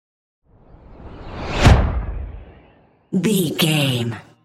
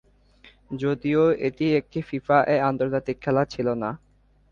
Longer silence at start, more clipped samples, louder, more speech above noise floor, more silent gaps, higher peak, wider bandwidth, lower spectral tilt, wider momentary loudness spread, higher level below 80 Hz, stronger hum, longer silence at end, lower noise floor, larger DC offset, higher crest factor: first, 0.9 s vs 0.7 s; neither; first, -19 LUFS vs -24 LUFS; about the same, 34 dB vs 32 dB; neither; first, 0 dBFS vs -6 dBFS; first, 16 kHz vs 7.2 kHz; second, -5.5 dB/octave vs -8 dB/octave; first, 22 LU vs 10 LU; first, -26 dBFS vs -56 dBFS; neither; second, 0.25 s vs 0.55 s; about the same, -53 dBFS vs -55 dBFS; neither; about the same, 20 dB vs 20 dB